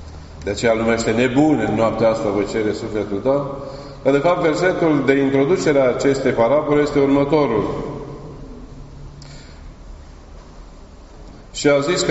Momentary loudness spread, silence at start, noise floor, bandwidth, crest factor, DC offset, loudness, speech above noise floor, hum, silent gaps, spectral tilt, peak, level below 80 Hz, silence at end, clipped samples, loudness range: 22 LU; 0 s; -40 dBFS; 8 kHz; 18 dB; under 0.1%; -17 LUFS; 23 dB; none; none; -5 dB/octave; -2 dBFS; -40 dBFS; 0 s; under 0.1%; 11 LU